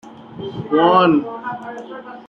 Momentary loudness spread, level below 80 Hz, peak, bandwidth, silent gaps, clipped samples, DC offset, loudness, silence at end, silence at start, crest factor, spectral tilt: 20 LU; -58 dBFS; -2 dBFS; 7 kHz; none; under 0.1%; under 0.1%; -16 LUFS; 0.05 s; 0.05 s; 16 dB; -8 dB/octave